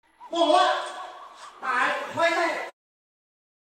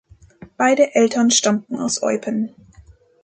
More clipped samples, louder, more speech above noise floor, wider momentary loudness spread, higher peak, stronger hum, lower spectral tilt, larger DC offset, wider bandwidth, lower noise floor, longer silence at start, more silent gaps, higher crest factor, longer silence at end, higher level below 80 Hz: neither; second, -24 LUFS vs -18 LUFS; second, 22 dB vs 31 dB; first, 20 LU vs 9 LU; second, -8 dBFS vs -2 dBFS; neither; about the same, -2 dB/octave vs -3 dB/octave; neither; first, 13.5 kHz vs 9.6 kHz; about the same, -45 dBFS vs -48 dBFS; second, 0.2 s vs 0.4 s; neither; about the same, 20 dB vs 18 dB; first, 0.95 s vs 0.75 s; second, -78 dBFS vs -56 dBFS